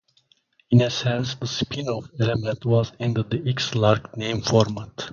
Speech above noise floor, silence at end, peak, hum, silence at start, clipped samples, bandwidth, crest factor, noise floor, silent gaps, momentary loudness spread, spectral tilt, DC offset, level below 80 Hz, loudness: 41 dB; 0 s; -2 dBFS; none; 0.7 s; under 0.1%; 7.2 kHz; 20 dB; -63 dBFS; none; 7 LU; -6 dB/octave; under 0.1%; -50 dBFS; -23 LUFS